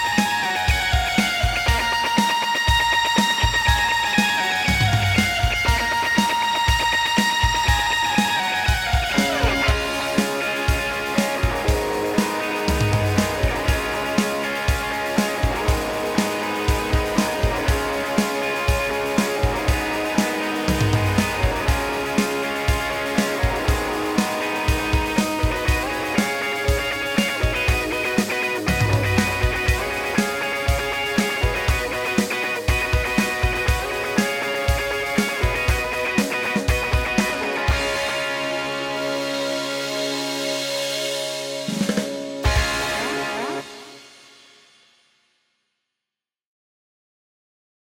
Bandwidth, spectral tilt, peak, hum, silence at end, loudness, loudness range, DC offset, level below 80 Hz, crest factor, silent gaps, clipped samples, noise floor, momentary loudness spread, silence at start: 18 kHz; -4 dB/octave; -2 dBFS; none; 3.85 s; -21 LUFS; 5 LU; under 0.1%; -30 dBFS; 20 dB; none; under 0.1%; -88 dBFS; 5 LU; 0 s